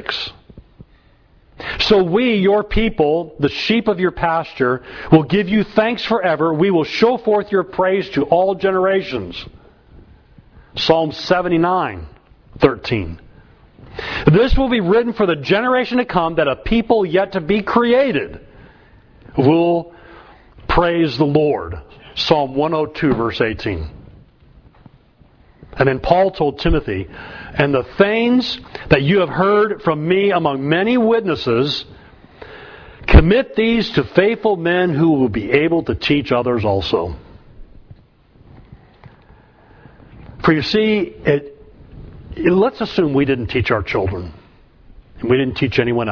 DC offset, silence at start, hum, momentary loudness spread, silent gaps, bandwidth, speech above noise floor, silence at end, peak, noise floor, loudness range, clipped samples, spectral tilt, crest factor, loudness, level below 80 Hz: under 0.1%; 0 s; none; 12 LU; none; 5.4 kHz; 35 dB; 0 s; 0 dBFS; -51 dBFS; 5 LU; under 0.1%; -7.5 dB/octave; 18 dB; -16 LUFS; -30 dBFS